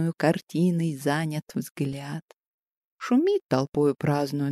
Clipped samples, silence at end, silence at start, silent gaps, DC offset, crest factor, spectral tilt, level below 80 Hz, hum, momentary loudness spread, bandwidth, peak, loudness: under 0.1%; 0 s; 0 s; 1.71-1.75 s, 2.22-2.28 s, 2.38-2.62 s, 2.77-2.96 s, 3.44-3.49 s, 3.68-3.72 s; under 0.1%; 18 dB; -7 dB/octave; -66 dBFS; none; 11 LU; 15 kHz; -8 dBFS; -26 LUFS